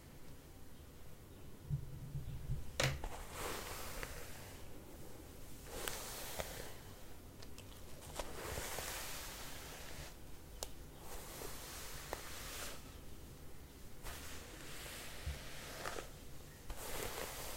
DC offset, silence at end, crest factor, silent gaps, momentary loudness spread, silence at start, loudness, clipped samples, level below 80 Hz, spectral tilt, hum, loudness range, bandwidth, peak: under 0.1%; 0 s; 30 dB; none; 13 LU; 0 s; -47 LUFS; under 0.1%; -54 dBFS; -3 dB/octave; none; 5 LU; 16 kHz; -18 dBFS